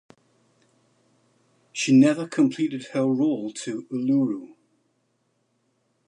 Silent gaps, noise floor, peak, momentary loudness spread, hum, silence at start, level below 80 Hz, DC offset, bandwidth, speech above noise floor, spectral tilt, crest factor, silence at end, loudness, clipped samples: none; -71 dBFS; -8 dBFS; 14 LU; none; 1.75 s; -78 dBFS; under 0.1%; 10.5 kHz; 49 dB; -5.5 dB/octave; 18 dB; 1.6 s; -23 LUFS; under 0.1%